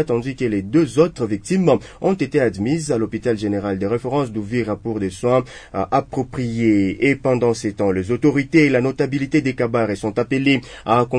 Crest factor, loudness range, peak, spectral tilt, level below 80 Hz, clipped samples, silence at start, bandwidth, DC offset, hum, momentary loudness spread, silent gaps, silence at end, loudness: 16 dB; 3 LU; -2 dBFS; -6.5 dB/octave; -46 dBFS; under 0.1%; 0 s; 10 kHz; under 0.1%; none; 6 LU; none; 0 s; -19 LUFS